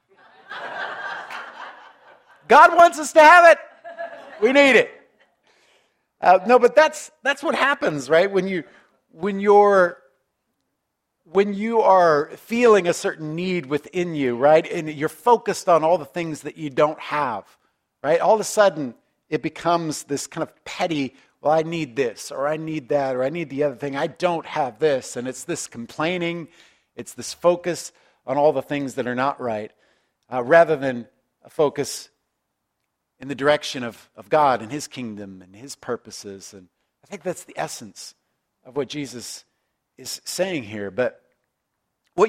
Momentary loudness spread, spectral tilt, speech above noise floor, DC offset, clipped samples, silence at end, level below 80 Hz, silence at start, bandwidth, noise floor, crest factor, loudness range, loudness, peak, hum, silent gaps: 19 LU; -4.5 dB/octave; 57 dB; under 0.1%; under 0.1%; 0 s; -68 dBFS; 0.5 s; 16 kHz; -77 dBFS; 22 dB; 14 LU; -20 LUFS; 0 dBFS; none; none